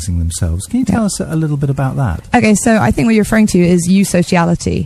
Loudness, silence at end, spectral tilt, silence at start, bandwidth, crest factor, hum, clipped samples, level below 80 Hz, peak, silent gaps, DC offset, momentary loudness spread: -13 LUFS; 0 s; -6 dB/octave; 0 s; 14.5 kHz; 12 dB; none; under 0.1%; -30 dBFS; 0 dBFS; none; under 0.1%; 6 LU